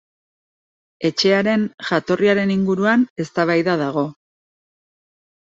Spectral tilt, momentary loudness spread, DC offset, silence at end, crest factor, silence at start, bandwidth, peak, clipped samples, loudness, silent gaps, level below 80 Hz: -6 dB/octave; 6 LU; under 0.1%; 1.3 s; 16 dB; 1 s; 7.8 kHz; -4 dBFS; under 0.1%; -19 LUFS; 1.74-1.78 s, 3.10-3.16 s; -60 dBFS